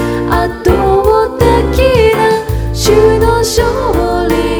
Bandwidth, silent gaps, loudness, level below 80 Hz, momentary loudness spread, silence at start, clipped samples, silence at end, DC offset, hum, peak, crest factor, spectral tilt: over 20 kHz; none; -10 LUFS; -20 dBFS; 5 LU; 0 s; 0.3%; 0 s; under 0.1%; none; 0 dBFS; 10 dB; -5.5 dB/octave